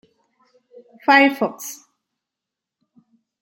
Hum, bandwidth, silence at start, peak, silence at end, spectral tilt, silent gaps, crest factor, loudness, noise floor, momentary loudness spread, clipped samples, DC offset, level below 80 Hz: none; 16.5 kHz; 1.1 s; -2 dBFS; 1.7 s; -3 dB/octave; none; 22 dB; -17 LUFS; -86 dBFS; 20 LU; under 0.1%; under 0.1%; -78 dBFS